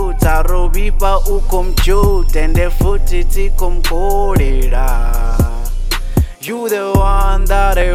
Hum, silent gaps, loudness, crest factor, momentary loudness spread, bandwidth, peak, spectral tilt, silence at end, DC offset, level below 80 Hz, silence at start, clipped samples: none; none; -16 LUFS; 10 dB; 5 LU; 15.5 kHz; 0 dBFS; -5.5 dB/octave; 0 s; under 0.1%; -12 dBFS; 0 s; under 0.1%